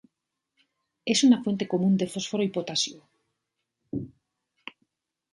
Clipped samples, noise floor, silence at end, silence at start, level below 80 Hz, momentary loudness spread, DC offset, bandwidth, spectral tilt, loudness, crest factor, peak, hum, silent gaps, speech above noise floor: under 0.1%; -83 dBFS; 1.25 s; 1.05 s; -66 dBFS; 24 LU; under 0.1%; 11.5 kHz; -4.5 dB/octave; -26 LUFS; 20 dB; -10 dBFS; none; none; 59 dB